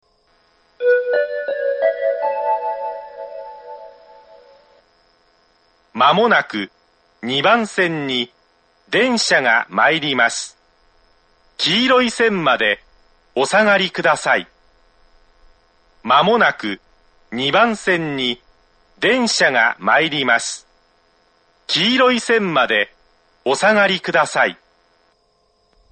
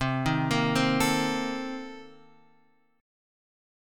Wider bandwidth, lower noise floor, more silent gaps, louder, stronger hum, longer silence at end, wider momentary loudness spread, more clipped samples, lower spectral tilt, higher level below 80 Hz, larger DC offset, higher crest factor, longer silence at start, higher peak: second, 9.4 kHz vs 17.5 kHz; second, -61 dBFS vs -66 dBFS; neither; first, -16 LUFS vs -27 LUFS; neither; second, 1.35 s vs 1.9 s; about the same, 17 LU vs 16 LU; neither; second, -3 dB/octave vs -5 dB/octave; second, -60 dBFS vs -52 dBFS; neither; about the same, 18 dB vs 18 dB; first, 0.8 s vs 0 s; first, 0 dBFS vs -12 dBFS